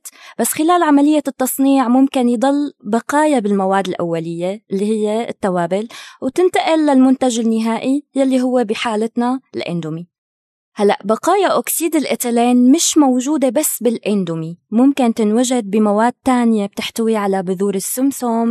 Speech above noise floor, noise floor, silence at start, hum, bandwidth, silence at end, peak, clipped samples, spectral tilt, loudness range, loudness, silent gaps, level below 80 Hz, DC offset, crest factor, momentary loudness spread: over 75 dB; under -90 dBFS; 0.05 s; none; 14 kHz; 0 s; -2 dBFS; under 0.1%; -4.5 dB/octave; 4 LU; -16 LUFS; 10.18-10.72 s; -64 dBFS; under 0.1%; 12 dB; 9 LU